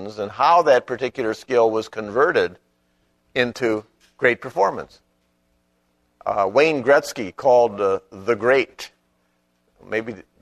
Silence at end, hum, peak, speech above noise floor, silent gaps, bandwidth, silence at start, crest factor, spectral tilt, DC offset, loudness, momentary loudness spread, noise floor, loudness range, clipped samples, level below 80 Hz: 0.2 s; 60 Hz at -55 dBFS; -2 dBFS; 47 dB; none; 13.5 kHz; 0 s; 20 dB; -4.5 dB/octave; under 0.1%; -20 LUFS; 12 LU; -67 dBFS; 5 LU; under 0.1%; -60 dBFS